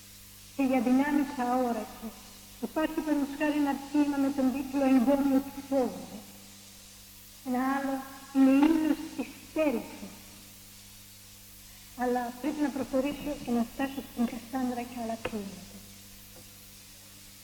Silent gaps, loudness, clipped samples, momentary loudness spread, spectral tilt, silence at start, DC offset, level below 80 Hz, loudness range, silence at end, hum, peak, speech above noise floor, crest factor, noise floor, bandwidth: none; -29 LUFS; under 0.1%; 23 LU; -5 dB/octave; 0 s; under 0.1%; -58 dBFS; 8 LU; 0 s; 50 Hz at -60 dBFS; -14 dBFS; 22 dB; 18 dB; -51 dBFS; 19 kHz